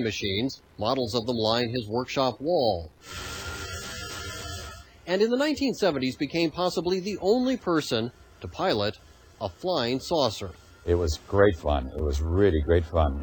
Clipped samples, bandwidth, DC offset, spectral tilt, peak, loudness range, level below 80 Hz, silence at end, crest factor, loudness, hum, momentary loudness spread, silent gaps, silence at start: under 0.1%; 19 kHz; under 0.1%; -5.5 dB/octave; -6 dBFS; 4 LU; -38 dBFS; 0 s; 20 dB; -27 LUFS; none; 13 LU; none; 0 s